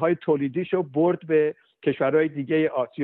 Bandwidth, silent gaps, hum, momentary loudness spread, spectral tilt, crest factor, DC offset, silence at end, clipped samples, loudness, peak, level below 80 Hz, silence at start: 4.1 kHz; none; none; 5 LU; -6 dB/octave; 14 dB; under 0.1%; 0 s; under 0.1%; -24 LUFS; -8 dBFS; -70 dBFS; 0 s